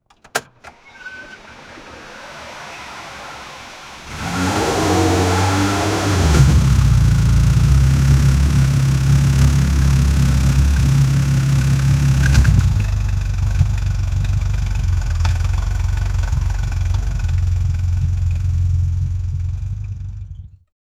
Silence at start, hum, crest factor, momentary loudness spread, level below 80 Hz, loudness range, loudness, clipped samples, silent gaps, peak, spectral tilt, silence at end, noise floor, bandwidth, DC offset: 0.35 s; none; 16 dB; 20 LU; -20 dBFS; 11 LU; -17 LUFS; under 0.1%; none; 0 dBFS; -6 dB/octave; 0.5 s; -43 dBFS; 15 kHz; under 0.1%